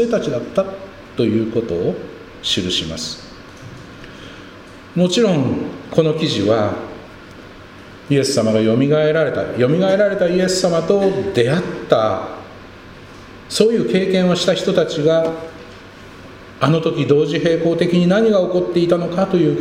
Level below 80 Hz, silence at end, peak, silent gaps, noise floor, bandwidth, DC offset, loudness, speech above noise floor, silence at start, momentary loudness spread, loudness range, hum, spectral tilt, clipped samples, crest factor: -48 dBFS; 0 s; 0 dBFS; none; -38 dBFS; 15.5 kHz; under 0.1%; -17 LUFS; 22 dB; 0 s; 23 LU; 6 LU; none; -5.5 dB/octave; under 0.1%; 18 dB